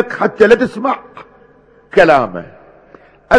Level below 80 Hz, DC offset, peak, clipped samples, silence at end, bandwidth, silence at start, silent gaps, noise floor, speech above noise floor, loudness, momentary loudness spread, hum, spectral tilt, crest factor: -46 dBFS; under 0.1%; 0 dBFS; 1%; 0 s; 11 kHz; 0 s; none; -47 dBFS; 34 dB; -13 LUFS; 13 LU; none; -6 dB/octave; 14 dB